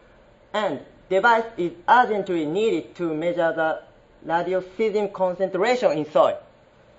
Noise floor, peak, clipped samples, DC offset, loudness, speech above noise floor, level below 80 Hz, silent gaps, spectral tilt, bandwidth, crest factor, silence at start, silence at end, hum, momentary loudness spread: -53 dBFS; -4 dBFS; under 0.1%; under 0.1%; -22 LUFS; 31 dB; -62 dBFS; none; -5.5 dB/octave; 8 kHz; 20 dB; 0.55 s; 0.55 s; none; 10 LU